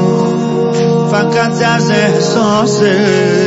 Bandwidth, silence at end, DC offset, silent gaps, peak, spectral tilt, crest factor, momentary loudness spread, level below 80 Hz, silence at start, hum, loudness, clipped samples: 8 kHz; 0 s; under 0.1%; none; 0 dBFS; -5.5 dB/octave; 10 dB; 3 LU; -50 dBFS; 0 s; none; -11 LUFS; under 0.1%